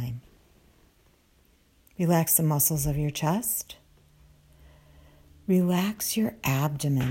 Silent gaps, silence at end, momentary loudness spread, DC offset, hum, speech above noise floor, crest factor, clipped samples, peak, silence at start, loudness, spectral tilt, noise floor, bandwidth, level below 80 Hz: none; 0 s; 19 LU; under 0.1%; none; 37 dB; 20 dB; under 0.1%; -8 dBFS; 0 s; -25 LUFS; -5 dB/octave; -62 dBFS; 16.5 kHz; -50 dBFS